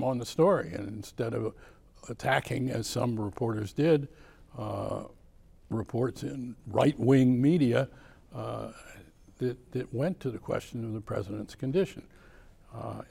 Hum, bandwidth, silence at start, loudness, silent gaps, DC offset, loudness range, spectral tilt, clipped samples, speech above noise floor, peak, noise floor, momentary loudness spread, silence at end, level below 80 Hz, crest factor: none; 16.5 kHz; 0 s; -30 LUFS; none; under 0.1%; 7 LU; -7 dB/octave; under 0.1%; 26 dB; -12 dBFS; -56 dBFS; 17 LU; 0.05 s; -56 dBFS; 20 dB